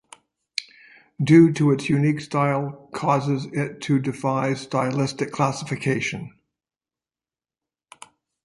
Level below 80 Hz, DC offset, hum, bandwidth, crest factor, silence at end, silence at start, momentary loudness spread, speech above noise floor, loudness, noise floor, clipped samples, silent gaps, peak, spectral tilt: -62 dBFS; under 0.1%; none; 11.5 kHz; 20 dB; 2.15 s; 0.6 s; 15 LU; over 69 dB; -22 LUFS; under -90 dBFS; under 0.1%; none; -4 dBFS; -6.5 dB/octave